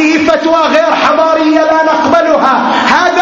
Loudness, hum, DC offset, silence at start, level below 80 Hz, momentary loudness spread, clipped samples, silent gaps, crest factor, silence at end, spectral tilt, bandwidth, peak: -8 LUFS; none; under 0.1%; 0 s; -46 dBFS; 1 LU; 0.2%; none; 8 dB; 0 s; -3.5 dB/octave; 7.6 kHz; 0 dBFS